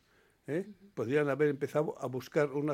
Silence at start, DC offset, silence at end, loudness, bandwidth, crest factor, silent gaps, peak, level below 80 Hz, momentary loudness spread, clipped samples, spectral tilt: 0.5 s; under 0.1%; 0 s; -33 LUFS; 15.5 kHz; 16 dB; none; -16 dBFS; -76 dBFS; 10 LU; under 0.1%; -7 dB/octave